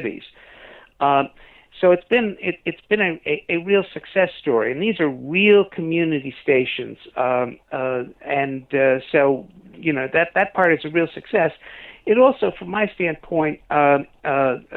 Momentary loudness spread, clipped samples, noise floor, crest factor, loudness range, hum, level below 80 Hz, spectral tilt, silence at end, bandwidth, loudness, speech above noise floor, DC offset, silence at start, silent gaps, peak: 9 LU; under 0.1%; -45 dBFS; 16 dB; 2 LU; none; -58 dBFS; -8.5 dB/octave; 0 s; 4.2 kHz; -20 LUFS; 25 dB; under 0.1%; 0 s; none; -4 dBFS